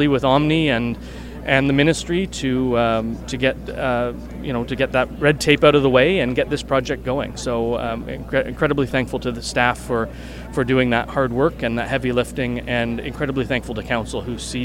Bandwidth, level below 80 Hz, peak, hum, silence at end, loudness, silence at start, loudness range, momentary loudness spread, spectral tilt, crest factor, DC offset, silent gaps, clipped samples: 16.5 kHz; -36 dBFS; 0 dBFS; none; 0 s; -20 LUFS; 0 s; 4 LU; 11 LU; -5.5 dB/octave; 20 dB; under 0.1%; none; under 0.1%